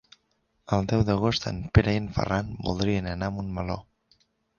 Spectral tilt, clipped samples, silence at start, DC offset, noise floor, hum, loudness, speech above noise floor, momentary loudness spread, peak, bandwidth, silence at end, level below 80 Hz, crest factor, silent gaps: -6.5 dB/octave; under 0.1%; 0.7 s; under 0.1%; -72 dBFS; none; -27 LUFS; 47 dB; 9 LU; -4 dBFS; 7.2 kHz; 0.75 s; -40 dBFS; 22 dB; none